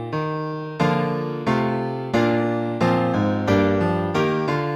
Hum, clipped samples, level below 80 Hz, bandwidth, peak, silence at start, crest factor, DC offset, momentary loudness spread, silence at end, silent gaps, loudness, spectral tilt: none; under 0.1%; -52 dBFS; 13.5 kHz; -6 dBFS; 0 s; 16 dB; under 0.1%; 6 LU; 0 s; none; -22 LUFS; -7.5 dB/octave